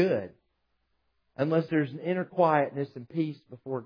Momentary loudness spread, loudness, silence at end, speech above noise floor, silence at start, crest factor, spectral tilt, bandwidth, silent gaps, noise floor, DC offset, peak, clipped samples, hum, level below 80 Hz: 15 LU; -29 LUFS; 0 s; 48 dB; 0 s; 20 dB; -9.5 dB/octave; 5.2 kHz; none; -76 dBFS; under 0.1%; -10 dBFS; under 0.1%; none; -78 dBFS